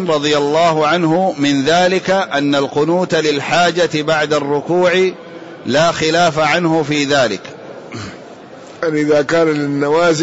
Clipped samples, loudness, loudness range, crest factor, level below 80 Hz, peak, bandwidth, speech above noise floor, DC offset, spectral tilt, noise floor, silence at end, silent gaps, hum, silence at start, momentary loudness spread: under 0.1%; -14 LUFS; 3 LU; 10 dB; -52 dBFS; -4 dBFS; 8 kHz; 21 dB; 0.2%; -4.5 dB/octave; -35 dBFS; 0 s; none; none; 0 s; 16 LU